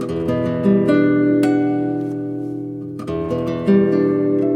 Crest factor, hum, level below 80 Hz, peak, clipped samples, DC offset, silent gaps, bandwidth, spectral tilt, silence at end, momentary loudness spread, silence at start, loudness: 14 dB; none; -48 dBFS; -2 dBFS; under 0.1%; under 0.1%; none; 9.8 kHz; -9 dB/octave; 0 s; 11 LU; 0 s; -18 LUFS